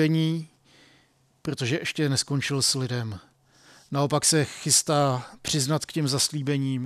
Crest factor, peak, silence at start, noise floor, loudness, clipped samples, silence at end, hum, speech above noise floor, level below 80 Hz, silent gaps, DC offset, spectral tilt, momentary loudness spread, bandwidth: 18 dB; -8 dBFS; 0 s; -63 dBFS; -24 LUFS; under 0.1%; 0 s; none; 38 dB; -62 dBFS; none; under 0.1%; -4 dB/octave; 11 LU; 16 kHz